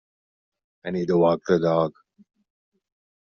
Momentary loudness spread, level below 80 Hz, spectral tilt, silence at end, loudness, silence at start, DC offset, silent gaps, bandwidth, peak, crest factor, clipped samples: 10 LU; -62 dBFS; -6.5 dB/octave; 1.45 s; -22 LUFS; 0.85 s; under 0.1%; none; 6.8 kHz; -8 dBFS; 18 dB; under 0.1%